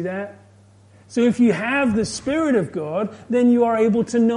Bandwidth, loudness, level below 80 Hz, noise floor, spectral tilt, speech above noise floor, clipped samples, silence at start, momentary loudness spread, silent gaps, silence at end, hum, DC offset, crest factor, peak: 10.5 kHz; -20 LUFS; -54 dBFS; -50 dBFS; -6 dB/octave; 31 dB; under 0.1%; 0 s; 10 LU; none; 0 s; none; under 0.1%; 14 dB; -6 dBFS